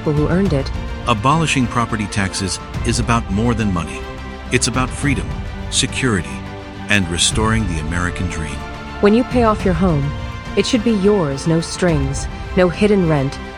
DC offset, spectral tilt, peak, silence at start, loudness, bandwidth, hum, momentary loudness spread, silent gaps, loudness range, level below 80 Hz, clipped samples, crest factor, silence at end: 0.2%; -5 dB/octave; 0 dBFS; 0 s; -17 LUFS; 19 kHz; none; 12 LU; none; 3 LU; -28 dBFS; under 0.1%; 18 dB; 0 s